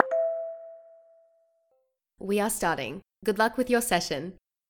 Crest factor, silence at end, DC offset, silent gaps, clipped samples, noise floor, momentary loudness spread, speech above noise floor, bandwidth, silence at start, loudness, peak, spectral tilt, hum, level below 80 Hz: 26 dB; 0.35 s; under 0.1%; none; under 0.1%; -74 dBFS; 16 LU; 47 dB; 19 kHz; 0 s; -28 LUFS; -2 dBFS; -3.5 dB/octave; none; -58 dBFS